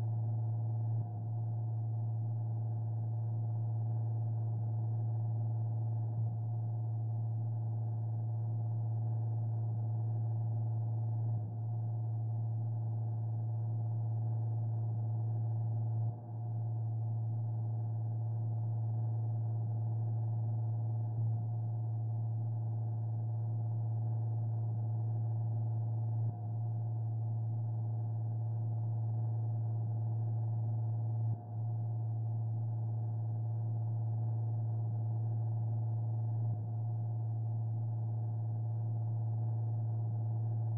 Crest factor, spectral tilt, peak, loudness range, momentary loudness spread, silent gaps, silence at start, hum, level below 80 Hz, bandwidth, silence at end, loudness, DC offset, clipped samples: 6 dB; -13.5 dB/octave; -28 dBFS; 1 LU; 1 LU; none; 0 s; none; -72 dBFS; 1.1 kHz; 0 s; -37 LUFS; under 0.1%; under 0.1%